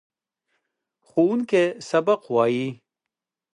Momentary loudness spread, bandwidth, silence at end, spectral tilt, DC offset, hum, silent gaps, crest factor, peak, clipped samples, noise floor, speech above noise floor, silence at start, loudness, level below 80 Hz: 7 LU; 10.5 kHz; 0.8 s; -6 dB/octave; under 0.1%; none; none; 18 dB; -8 dBFS; under 0.1%; -86 dBFS; 65 dB; 1.15 s; -22 LUFS; -76 dBFS